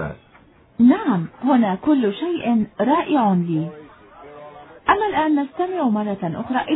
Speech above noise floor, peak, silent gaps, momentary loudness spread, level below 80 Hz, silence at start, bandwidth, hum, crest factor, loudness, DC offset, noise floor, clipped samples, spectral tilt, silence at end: 32 dB; -2 dBFS; none; 12 LU; -54 dBFS; 0 s; 4.1 kHz; none; 18 dB; -20 LUFS; under 0.1%; -51 dBFS; under 0.1%; -11 dB/octave; 0 s